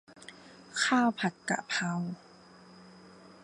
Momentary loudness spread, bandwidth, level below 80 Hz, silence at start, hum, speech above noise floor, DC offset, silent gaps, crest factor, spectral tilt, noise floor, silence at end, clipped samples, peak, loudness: 23 LU; 11.5 kHz; -78 dBFS; 0.1 s; none; 25 dB; under 0.1%; none; 20 dB; -4 dB/octave; -55 dBFS; 0.15 s; under 0.1%; -14 dBFS; -31 LUFS